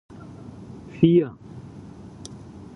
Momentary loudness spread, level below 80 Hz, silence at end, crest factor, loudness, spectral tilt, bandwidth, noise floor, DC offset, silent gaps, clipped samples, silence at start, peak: 24 LU; -54 dBFS; 0.4 s; 22 dB; -20 LUFS; -8.5 dB/octave; 10.5 kHz; -42 dBFS; under 0.1%; none; under 0.1%; 0.6 s; -4 dBFS